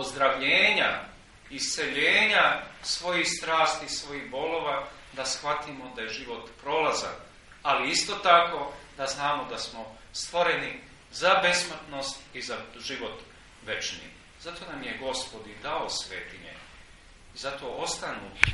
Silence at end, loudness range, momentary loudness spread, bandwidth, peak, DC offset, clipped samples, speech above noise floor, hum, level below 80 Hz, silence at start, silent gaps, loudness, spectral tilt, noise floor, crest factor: 0 s; 11 LU; 19 LU; 11.5 kHz; 0 dBFS; under 0.1%; under 0.1%; 23 dB; none; -54 dBFS; 0 s; none; -27 LUFS; -1.5 dB/octave; -52 dBFS; 28 dB